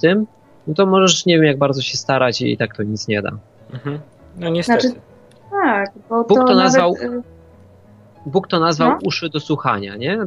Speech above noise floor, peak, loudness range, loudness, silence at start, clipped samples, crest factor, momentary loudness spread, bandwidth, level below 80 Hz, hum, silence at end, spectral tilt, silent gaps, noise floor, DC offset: 29 dB; 0 dBFS; 5 LU; -17 LUFS; 0 s; under 0.1%; 16 dB; 16 LU; 11 kHz; -56 dBFS; none; 0 s; -4.5 dB/octave; none; -46 dBFS; under 0.1%